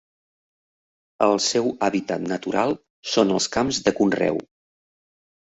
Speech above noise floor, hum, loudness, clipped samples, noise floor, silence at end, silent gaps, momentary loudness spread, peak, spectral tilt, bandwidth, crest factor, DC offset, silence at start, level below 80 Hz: over 68 dB; none; -22 LUFS; under 0.1%; under -90 dBFS; 1.05 s; 2.90-3.03 s; 6 LU; -4 dBFS; -4 dB/octave; 8.2 kHz; 20 dB; under 0.1%; 1.2 s; -58 dBFS